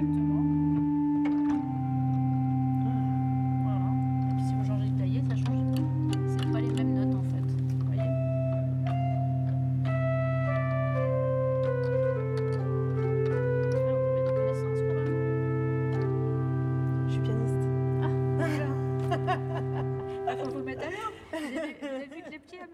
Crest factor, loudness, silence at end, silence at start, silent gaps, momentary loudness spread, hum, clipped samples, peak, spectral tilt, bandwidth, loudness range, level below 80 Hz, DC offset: 12 dB; -29 LUFS; 0 s; 0 s; none; 6 LU; none; under 0.1%; -16 dBFS; -9 dB/octave; 7.4 kHz; 2 LU; -58 dBFS; under 0.1%